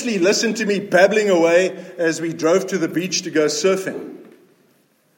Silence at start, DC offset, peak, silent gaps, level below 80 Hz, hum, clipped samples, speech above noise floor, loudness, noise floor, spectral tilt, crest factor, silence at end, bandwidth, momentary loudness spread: 0 s; under 0.1%; -2 dBFS; none; -74 dBFS; none; under 0.1%; 42 dB; -18 LUFS; -59 dBFS; -3.5 dB/octave; 18 dB; 0.95 s; 17 kHz; 8 LU